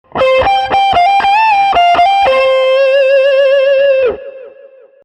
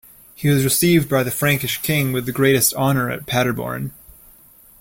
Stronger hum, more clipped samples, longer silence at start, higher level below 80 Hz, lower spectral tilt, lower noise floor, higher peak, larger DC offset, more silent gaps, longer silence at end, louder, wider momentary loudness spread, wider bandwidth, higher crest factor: neither; neither; second, 0.15 s vs 0.4 s; first, -42 dBFS vs -48 dBFS; about the same, -3.5 dB/octave vs -4.5 dB/octave; second, -39 dBFS vs -48 dBFS; about the same, -2 dBFS vs -2 dBFS; neither; neither; second, 0.55 s vs 0.9 s; first, -9 LUFS vs -18 LUFS; second, 2 LU vs 9 LU; second, 8.8 kHz vs 17 kHz; second, 8 dB vs 18 dB